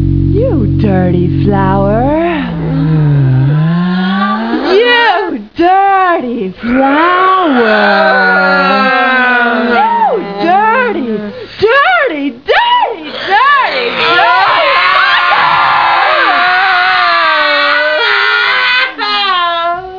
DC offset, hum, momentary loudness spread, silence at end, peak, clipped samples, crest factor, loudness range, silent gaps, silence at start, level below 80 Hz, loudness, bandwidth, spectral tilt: 0.4%; none; 6 LU; 0 s; 0 dBFS; 0.2%; 10 dB; 3 LU; none; 0 s; -32 dBFS; -9 LUFS; 5.4 kHz; -7.5 dB/octave